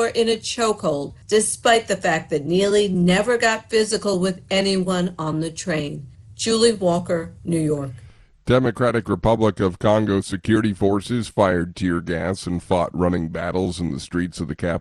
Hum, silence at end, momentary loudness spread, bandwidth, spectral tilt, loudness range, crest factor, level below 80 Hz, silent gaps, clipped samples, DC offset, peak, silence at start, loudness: none; 0 s; 8 LU; 12 kHz; -5 dB/octave; 3 LU; 18 dB; -44 dBFS; none; under 0.1%; under 0.1%; -2 dBFS; 0 s; -21 LUFS